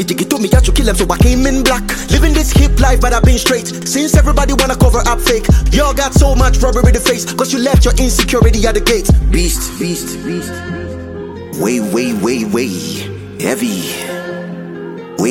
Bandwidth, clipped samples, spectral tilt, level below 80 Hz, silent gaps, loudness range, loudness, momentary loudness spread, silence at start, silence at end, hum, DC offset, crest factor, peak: 16.5 kHz; under 0.1%; -4.5 dB/octave; -14 dBFS; none; 6 LU; -13 LUFS; 12 LU; 0 s; 0 s; none; under 0.1%; 12 dB; 0 dBFS